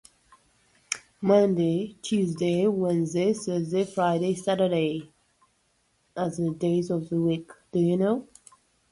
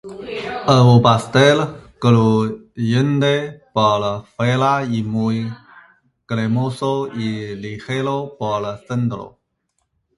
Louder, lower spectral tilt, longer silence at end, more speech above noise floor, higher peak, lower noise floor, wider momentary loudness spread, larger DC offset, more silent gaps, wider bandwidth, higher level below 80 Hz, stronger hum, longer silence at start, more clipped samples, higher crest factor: second, -26 LUFS vs -18 LUFS; about the same, -6.5 dB/octave vs -6.5 dB/octave; second, 0.7 s vs 0.9 s; second, 45 dB vs 54 dB; second, -6 dBFS vs 0 dBFS; about the same, -69 dBFS vs -71 dBFS; second, 9 LU vs 13 LU; neither; neither; about the same, 11.5 kHz vs 11.5 kHz; second, -66 dBFS vs -52 dBFS; neither; first, 0.9 s vs 0.05 s; neither; about the same, 20 dB vs 18 dB